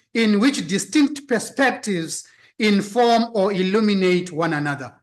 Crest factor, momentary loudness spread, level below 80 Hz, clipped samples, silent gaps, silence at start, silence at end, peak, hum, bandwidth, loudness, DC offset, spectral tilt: 12 dB; 8 LU; -68 dBFS; under 0.1%; none; 0.15 s; 0.15 s; -8 dBFS; none; 12.5 kHz; -20 LUFS; under 0.1%; -5 dB/octave